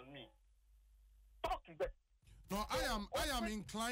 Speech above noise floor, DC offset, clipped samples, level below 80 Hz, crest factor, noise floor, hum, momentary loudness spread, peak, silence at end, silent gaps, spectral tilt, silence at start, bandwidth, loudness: 29 dB; under 0.1%; under 0.1%; -54 dBFS; 16 dB; -69 dBFS; none; 13 LU; -28 dBFS; 0 s; none; -3.5 dB/octave; 0 s; 16 kHz; -42 LUFS